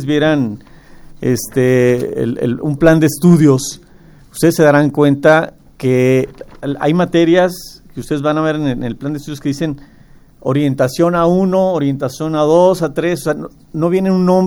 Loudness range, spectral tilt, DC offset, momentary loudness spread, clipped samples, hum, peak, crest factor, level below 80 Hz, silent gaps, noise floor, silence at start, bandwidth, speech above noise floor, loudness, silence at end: 5 LU; -6.5 dB/octave; under 0.1%; 13 LU; under 0.1%; none; 0 dBFS; 14 dB; -42 dBFS; none; -42 dBFS; 0 s; over 20 kHz; 29 dB; -14 LUFS; 0 s